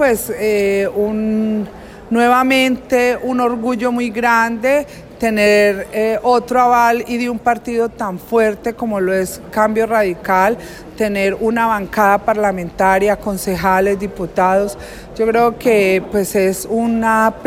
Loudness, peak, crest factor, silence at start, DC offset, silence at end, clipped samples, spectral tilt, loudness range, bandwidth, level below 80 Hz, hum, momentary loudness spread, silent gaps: -15 LUFS; -2 dBFS; 12 dB; 0 s; under 0.1%; 0 s; under 0.1%; -5 dB/octave; 2 LU; 16.5 kHz; -42 dBFS; none; 7 LU; none